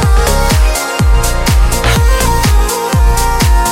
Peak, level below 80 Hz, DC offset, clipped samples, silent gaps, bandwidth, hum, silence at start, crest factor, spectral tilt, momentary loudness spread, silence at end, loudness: 0 dBFS; -10 dBFS; under 0.1%; under 0.1%; none; 16.5 kHz; none; 0 s; 8 dB; -4.5 dB/octave; 2 LU; 0 s; -11 LUFS